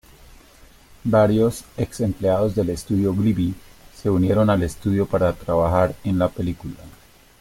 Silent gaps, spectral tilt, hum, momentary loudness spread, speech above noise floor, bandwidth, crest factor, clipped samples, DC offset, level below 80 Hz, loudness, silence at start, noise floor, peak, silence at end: none; -7.5 dB/octave; none; 10 LU; 29 dB; 16.5 kHz; 16 dB; under 0.1%; under 0.1%; -42 dBFS; -21 LUFS; 1.05 s; -49 dBFS; -4 dBFS; 0.5 s